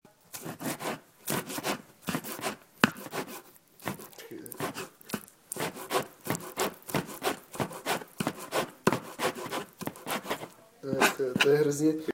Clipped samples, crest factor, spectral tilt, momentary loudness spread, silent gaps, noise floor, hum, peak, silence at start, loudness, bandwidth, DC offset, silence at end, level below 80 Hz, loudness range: under 0.1%; 32 dB; -3.5 dB/octave; 15 LU; none; -51 dBFS; none; 0 dBFS; 0.35 s; -32 LUFS; 17 kHz; under 0.1%; 0 s; -68 dBFS; 6 LU